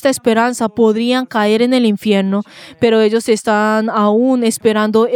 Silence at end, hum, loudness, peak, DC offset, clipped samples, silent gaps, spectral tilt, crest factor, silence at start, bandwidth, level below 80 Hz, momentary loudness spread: 0 s; none; -14 LUFS; 0 dBFS; under 0.1%; under 0.1%; none; -5 dB/octave; 12 dB; 0.05 s; 16.5 kHz; -58 dBFS; 3 LU